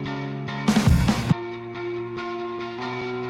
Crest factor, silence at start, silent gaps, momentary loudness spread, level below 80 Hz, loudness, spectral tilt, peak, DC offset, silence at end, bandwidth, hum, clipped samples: 18 dB; 0 s; none; 12 LU; -36 dBFS; -25 LUFS; -6 dB/octave; -6 dBFS; under 0.1%; 0 s; 16.5 kHz; none; under 0.1%